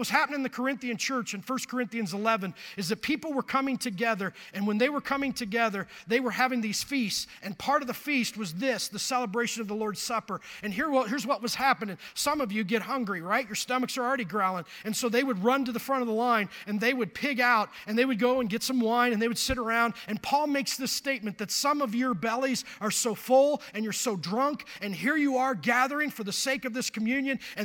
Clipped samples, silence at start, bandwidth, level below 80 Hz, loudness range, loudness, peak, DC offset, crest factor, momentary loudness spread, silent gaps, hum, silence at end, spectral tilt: under 0.1%; 0 s; 17.5 kHz; -60 dBFS; 3 LU; -28 LUFS; -8 dBFS; under 0.1%; 20 dB; 7 LU; none; none; 0 s; -3.5 dB/octave